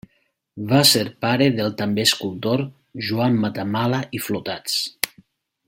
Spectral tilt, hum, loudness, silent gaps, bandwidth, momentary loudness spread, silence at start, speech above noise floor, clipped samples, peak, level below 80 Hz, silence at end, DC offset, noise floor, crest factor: -4 dB/octave; none; -20 LUFS; none; 16.5 kHz; 11 LU; 0.55 s; 47 dB; under 0.1%; 0 dBFS; -60 dBFS; 0.6 s; under 0.1%; -67 dBFS; 22 dB